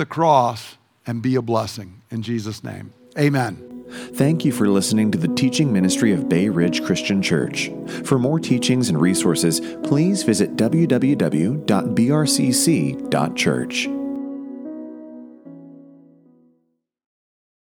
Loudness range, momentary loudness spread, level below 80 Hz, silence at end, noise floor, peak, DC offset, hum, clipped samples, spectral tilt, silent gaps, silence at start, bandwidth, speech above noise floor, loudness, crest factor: 7 LU; 16 LU; -60 dBFS; 1.95 s; -68 dBFS; -2 dBFS; under 0.1%; none; under 0.1%; -5 dB/octave; none; 0 s; 19.5 kHz; 49 dB; -19 LUFS; 18 dB